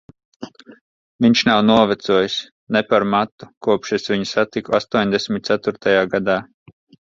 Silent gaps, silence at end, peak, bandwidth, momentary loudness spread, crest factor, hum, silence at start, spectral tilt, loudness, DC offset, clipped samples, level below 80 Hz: 0.81-1.19 s, 2.52-2.67 s, 3.32-3.38 s, 3.57-3.61 s; 0.6 s; 0 dBFS; 7.6 kHz; 12 LU; 18 dB; none; 0.4 s; -5 dB/octave; -18 LUFS; under 0.1%; under 0.1%; -56 dBFS